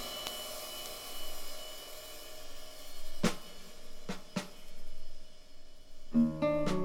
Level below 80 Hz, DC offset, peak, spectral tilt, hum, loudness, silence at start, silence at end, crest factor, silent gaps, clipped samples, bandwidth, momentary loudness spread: -46 dBFS; under 0.1%; -14 dBFS; -4.5 dB/octave; none; -38 LUFS; 0 s; 0 s; 20 dB; none; under 0.1%; 17 kHz; 24 LU